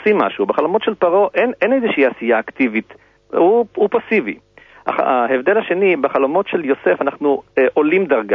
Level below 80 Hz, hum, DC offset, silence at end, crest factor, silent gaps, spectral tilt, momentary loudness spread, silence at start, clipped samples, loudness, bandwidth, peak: -62 dBFS; none; under 0.1%; 0 s; 14 dB; none; -8 dB/octave; 5 LU; 0 s; under 0.1%; -16 LUFS; 5.2 kHz; -2 dBFS